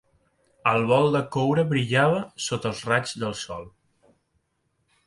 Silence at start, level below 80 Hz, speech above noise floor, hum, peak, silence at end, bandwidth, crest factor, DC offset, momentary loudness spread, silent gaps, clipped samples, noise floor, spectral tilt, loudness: 0.65 s; -60 dBFS; 49 dB; none; -6 dBFS; 1.4 s; 11.5 kHz; 20 dB; under 0.1%; 10 LU; none; under 0.1%; -73 dBFS; -5.5 dB/octave; -24 LUFS